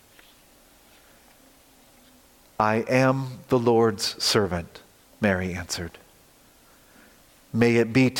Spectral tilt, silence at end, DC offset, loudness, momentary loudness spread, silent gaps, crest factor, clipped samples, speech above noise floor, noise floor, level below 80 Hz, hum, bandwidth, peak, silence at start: -5 dB/octave; 0 s; under 0.1%; -23 LUFS; 12 LU; none; 20 dB; under 0.1%; 33 dB; -56 dBFS; -58 dBFS; none; 17 kHz; -6 dBFS; 2.6 s